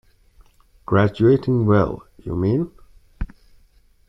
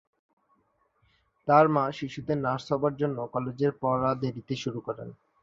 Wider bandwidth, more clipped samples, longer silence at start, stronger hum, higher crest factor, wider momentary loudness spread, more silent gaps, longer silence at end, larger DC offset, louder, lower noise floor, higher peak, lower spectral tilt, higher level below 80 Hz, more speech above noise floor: second, 6 kHz vs 7.6 kHz; neither; second, 0.9 s vs 1.45 s; neither; about the same, 18 dB vs 22 dB; first, 19 LU vs 15 LU; neither; first, 0.85 s vs 0.3 s; neither; first, -19 LUFS vs -28 LUFS; second, -55 dBFS vs -70 dBFS; first, -2 dBFS vs -6 dBFS; first, -10 dB/octave vs -7.5 dB/octave; first, -40 dBFS vs -62 dBFS; second, 37 dB vs 43 dB